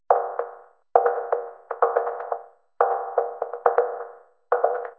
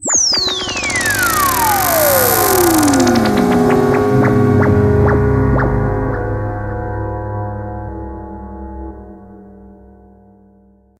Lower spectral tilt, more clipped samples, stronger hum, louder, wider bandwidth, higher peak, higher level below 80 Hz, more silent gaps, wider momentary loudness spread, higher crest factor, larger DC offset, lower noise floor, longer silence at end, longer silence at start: first, -6 dB/octave vs -4.5 dB/octave; neither; neither; second, -25 LUFS vs -13 LUFS; second, 3.1 kHz vs 16.5 kHz; about the same, 0 dBFS vs 0 dBFS; second, -84 dBFS vs -28 dBFS; neither; second, 12 LU vs 17 LU; first, 26 dB vs 14 dB; neither; second, -45 dBFS vs -49 dBFS; second, 0.05 s vs 1.25 s; about the same, 0.1 s vs 0 s